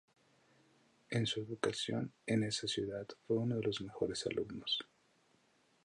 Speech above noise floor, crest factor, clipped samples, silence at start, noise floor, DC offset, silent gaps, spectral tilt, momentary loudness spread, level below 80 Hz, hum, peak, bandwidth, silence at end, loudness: 35 dB; 20 dB; under 0.1%; 1.1 s; -73 dBFS; under 0.1%; none; -5 dB/octave; 5 LU; -70 dBFS; none; -20 dBFS; 11.5 kHz; 1 s; -38 LUFS